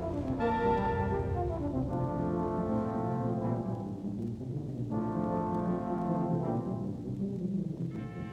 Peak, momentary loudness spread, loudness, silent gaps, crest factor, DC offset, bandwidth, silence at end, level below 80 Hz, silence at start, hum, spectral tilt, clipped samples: -16 dBFS; 7 LU; -33 LUFS; none; 16 dB; under 0.1%; 9 kHz; 0 s; -48 dBFS; 0 s; none; -9.5 dB/octave; under 0.1%